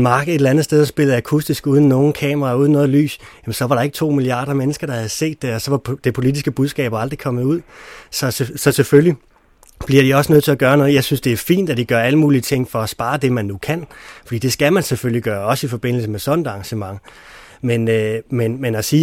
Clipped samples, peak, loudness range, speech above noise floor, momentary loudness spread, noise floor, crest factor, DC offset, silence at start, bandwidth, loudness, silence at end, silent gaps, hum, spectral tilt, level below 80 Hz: under 0.1%; 0 dBFS; 6 LU; 33 dB; 11 LU; -50 dBFS; 16 dB; under 0.1%; 0 s; 17 kHz; -17 LUFS; 0 s; none; none; -6 dB/octave; -48 dBFS